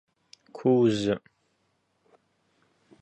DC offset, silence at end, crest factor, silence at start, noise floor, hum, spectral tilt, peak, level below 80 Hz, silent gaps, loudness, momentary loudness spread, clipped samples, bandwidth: under 0.1%; 1.85 s; 18 dB; 0.55 s; -73 dBFS; none; -7 dB/octave; -12 dBFS; -64 dBFS; none; -25 LUFS; 13 LU; under 0.1%; 8.8 kHz